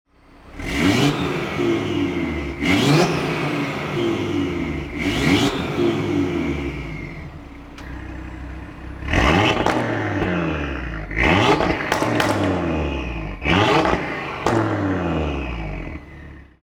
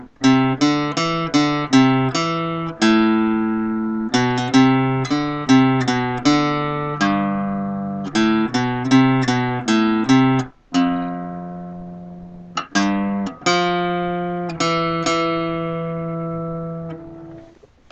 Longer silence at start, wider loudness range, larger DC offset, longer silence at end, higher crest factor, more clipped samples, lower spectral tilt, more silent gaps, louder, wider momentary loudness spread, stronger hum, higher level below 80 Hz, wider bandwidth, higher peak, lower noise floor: first, 0.45 s vs 0 s; about the same, 4 LU vs 5 LU; neither; second, 0.2 s vs 0.45 s; about the same, 18 dB vs 16 dB; neither; about the same, -5.5 dB/octave vs -5.5 dB/octave; neither; about the same, -20 LUFS vs -19 LUFS; first, 18 LU vs 14 LU; neither; first, -34 dBFS vs -50 dBFS; first, 18 kHz vs 8.8 kHz; about the same, -2 dBFS vs -2 dBFS; about the same, -45 dBFS vs -46 dBFS